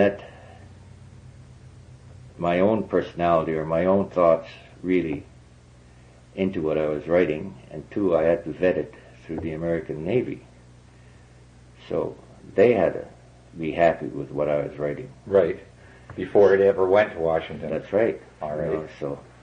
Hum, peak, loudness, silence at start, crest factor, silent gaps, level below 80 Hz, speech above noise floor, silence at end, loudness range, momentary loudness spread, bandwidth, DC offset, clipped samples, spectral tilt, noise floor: none; -6 dBFS; -24 LUFS; 0 s; 18 dB; none; -54 dBFS; 27 dB; 0.25 s; 5 LU; 16 LU; 9.4 kHz; under 0.1%; under 0.1%; -8 dB/octave; -50 dBFS